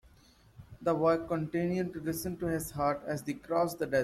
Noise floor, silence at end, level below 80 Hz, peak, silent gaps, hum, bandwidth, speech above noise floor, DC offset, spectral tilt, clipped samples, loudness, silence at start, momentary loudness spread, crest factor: -61 dBFS; 0 s; -58 dBFS; -16 dBFS; none; none; 16 kHz; 30 dB; under 0.1%; -6 dB/octave; under 0.1%; -32 LUFS; 0.6 s; 7 LU; 16 dB